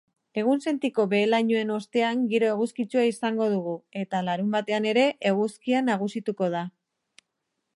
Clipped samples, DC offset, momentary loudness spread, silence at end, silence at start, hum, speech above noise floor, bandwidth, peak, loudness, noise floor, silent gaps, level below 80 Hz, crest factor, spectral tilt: under 0.1%; under 0.1%; 7 LU; 1.05 s; 0.35 s; none; 56 dB; 11.5 kHz; -8 dBFS; -25 LUFS; -80 dBFS; none; -78 dBFS; 18 dB; -6 dB/octave